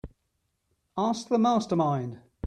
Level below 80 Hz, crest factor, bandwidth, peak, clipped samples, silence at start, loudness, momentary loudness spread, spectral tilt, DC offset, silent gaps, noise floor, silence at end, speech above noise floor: -58 dBFS; 16 dB; 9.8 kHz; -12 dBFS; under 0.1%; 0.05 s; -27 LUFS; 12 LU; -7 dB/octave; under 0.1%; none; -77 dBFS; 0 s; 51 dB